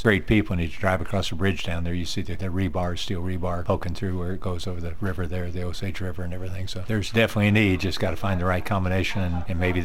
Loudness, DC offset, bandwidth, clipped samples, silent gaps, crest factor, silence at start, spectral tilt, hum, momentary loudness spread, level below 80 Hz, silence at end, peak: -26 LUFS; 3%; 15.5 kHz; under 0.1%; none; 20 dB; 0 s; -6 dB/octave; none; 10 LU; -38 dBFS; 0 s; -6 dBFS